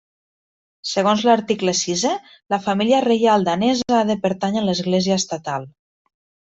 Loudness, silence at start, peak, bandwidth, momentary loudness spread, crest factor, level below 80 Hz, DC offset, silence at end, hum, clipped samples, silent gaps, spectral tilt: -19 LUFS; 0.85 s; -4 dBFS; 8.2 kHz; 9 LU; 16 dB; -60 dBFS; under 0.1%; 0.85 s; none; under 0.1%; none; -4.5 dB/octave